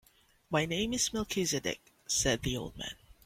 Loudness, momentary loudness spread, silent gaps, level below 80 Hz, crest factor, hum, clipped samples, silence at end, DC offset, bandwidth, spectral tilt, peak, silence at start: -32 LUFS; 12 LU; none; -52 dBFS; 18 dB; none; under 0.1%; 0.3 s; under 0.1%; 16.5 kHz; -3 dB/octave; -16 dBFS; 0.5 s